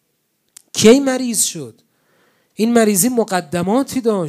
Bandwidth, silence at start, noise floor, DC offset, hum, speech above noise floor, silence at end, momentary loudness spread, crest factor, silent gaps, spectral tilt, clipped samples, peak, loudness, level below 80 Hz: 16 kHz; 0.75 s; -67 dBFS; under 0.1%; none; 52 dB; 0 s; 11 LU; 16 dB; none; -4 dB/octave; under 0.1%; 0 dBFS; -15 LUFS; -58 dBFS